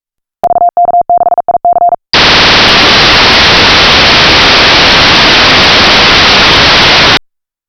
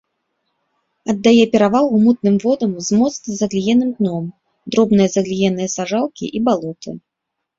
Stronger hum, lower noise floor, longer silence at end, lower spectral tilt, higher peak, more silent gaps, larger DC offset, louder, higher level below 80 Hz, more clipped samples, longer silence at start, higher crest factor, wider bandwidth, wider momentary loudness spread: neither; second, -53 dBFS vs -78 dBFS; about the same, 0.5 s vs 0.6 s; second, -2.5 dB/octave vs -5.5 dB/octave; about the same, 0 dBFS vs -2 dBFS; neither; neither; first, -3 LUFS vs -16 LUFS; first, -24 dBFS vs -54 dBFS; first, 0.5% vs under 0.1%; second, 0.45 s vs 1.05 s; second, 4 dB vs 16 dB; first, 19.5 kHz vs 7.8 kHz; second, 7 LU vs 13 LU